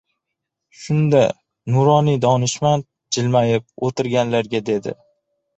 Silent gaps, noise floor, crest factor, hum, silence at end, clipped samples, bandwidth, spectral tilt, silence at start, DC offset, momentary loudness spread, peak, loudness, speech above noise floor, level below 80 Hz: none; -80 dBFS; 16 dB; none; 0.65 s; under 0.1%; 8.2 kHz; -6 dB/octave; 0.8 s; under 0.1%; 10 LU; -2 dBFS; -18 LUFS; 63 dB; -56 dBFS